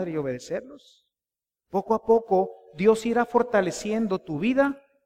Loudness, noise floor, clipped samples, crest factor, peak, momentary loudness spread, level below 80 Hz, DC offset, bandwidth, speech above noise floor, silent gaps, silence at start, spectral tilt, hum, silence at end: -25 LUFS; under -90 dBFS; under 0.1%; 18 dB; -8 dBFS; 10 LU; -58 dBFS; under 0.1%; 13.5 kHz; over 66 dB; none; 0 s; -6 dB/octave; none; 0.3 s